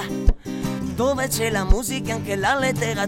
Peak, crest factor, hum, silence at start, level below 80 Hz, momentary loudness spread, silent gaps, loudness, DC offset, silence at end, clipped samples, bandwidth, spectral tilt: -2 dBFS; 20 dB; none; 0 s; -26 dBFS; 6 LU; none; -23 LUFS; under 0.1%; 0 s; under 0.1%; 16.5 kHz; -4.5 dB/octave